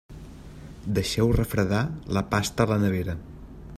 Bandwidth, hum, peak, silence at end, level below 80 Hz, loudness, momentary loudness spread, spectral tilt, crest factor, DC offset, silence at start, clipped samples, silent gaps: 15.5 kHz; none; -6 dBFS; 0 s; -40 dBFS; -25 LUFS; 21 LU; -6 dB/octave; 20 dB; under 0.1%; 0.1 s; under 0.1%; none